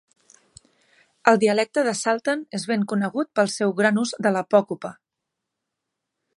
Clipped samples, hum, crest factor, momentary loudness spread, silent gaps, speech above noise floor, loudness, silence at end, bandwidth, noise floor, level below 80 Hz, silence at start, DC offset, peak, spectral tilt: under 0.1%; none; 22 dB; 7 LU; none; 61 dB; -22 LUFS; 1.45 s; 11.5 kHz; -83 dBFS; -72 dBFS; 1.25 s; under 0.1%; 0 dBFS; -4.5 dB/octave